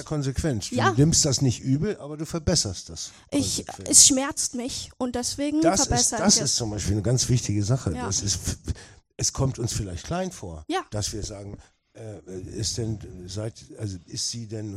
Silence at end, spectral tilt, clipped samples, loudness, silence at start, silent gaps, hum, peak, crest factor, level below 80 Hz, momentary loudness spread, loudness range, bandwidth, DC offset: 0 s; -3.5 dB/octave; under 0.1%; -23 LUFS; 0 s; none; none; 0 dBFS; 24 dB; -44 dBFS; 17 LU; 12 LU; 15.5 kHz; under 0.1%